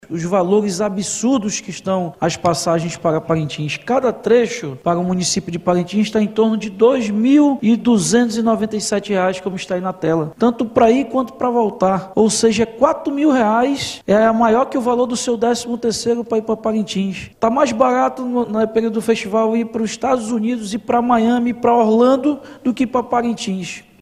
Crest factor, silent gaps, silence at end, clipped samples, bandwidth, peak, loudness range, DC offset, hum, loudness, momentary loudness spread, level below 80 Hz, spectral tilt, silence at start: 16 dB; none; 0.2 s; under 0.1%; 13.5 kHz; 0 dBFS; 3 LU; under 0.1%; none; -17 LUFS; 7 LU; -52 dBFS; -5 dB/octave; 0.1 s